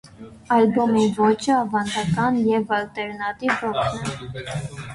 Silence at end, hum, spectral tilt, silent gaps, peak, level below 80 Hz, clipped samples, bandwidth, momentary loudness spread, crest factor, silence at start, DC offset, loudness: 0 s; none; -5.5 dB/octave; none; -6 dBFS; -52 dBFS; under 0.1%; 11.5 kHz; 12 LU; 16 dB; 0.05 s; under 0.1%; -22 LUFS